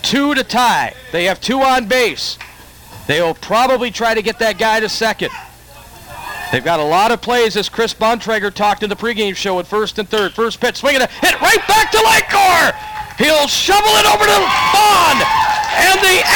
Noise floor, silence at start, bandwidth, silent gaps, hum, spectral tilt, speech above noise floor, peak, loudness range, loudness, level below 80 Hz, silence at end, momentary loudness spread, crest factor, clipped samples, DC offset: -38 dBFS; 0.05 s; 17.5 kHz; none; none; -2 dB/octave; 25 dB; 0 dBFS; 6 LU; -13 LUFS; -42 dBFS; 0 s; 9 LU; 14 dB; under 0.1%; under 0.1%